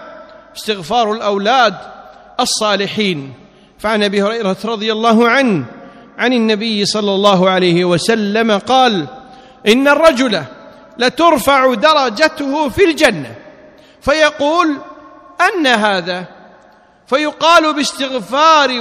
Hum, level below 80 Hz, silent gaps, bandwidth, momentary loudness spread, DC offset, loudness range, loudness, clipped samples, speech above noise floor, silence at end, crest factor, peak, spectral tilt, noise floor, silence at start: none; -46 dBFS; none; 15.5 kHz; 12 LU; under 0.1%; 4 LU; -13 LUFS; 0.2%; 34 dB; 0 s; 14 dB; 0 dBFS; -4 dB/octave; -46 dBFS; 0 s